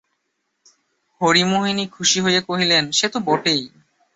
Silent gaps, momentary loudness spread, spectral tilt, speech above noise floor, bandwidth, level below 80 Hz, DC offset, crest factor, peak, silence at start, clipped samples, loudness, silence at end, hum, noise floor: none; 7 LU; -3 dB/octave; 54 dB; 8.4 kHz; -62 dBFS; under 0.1%; 18 dB; -4 dBFS; 1.2 s; under 0.1%; -18 LUFS; 0.5 s; none; -73 dBFS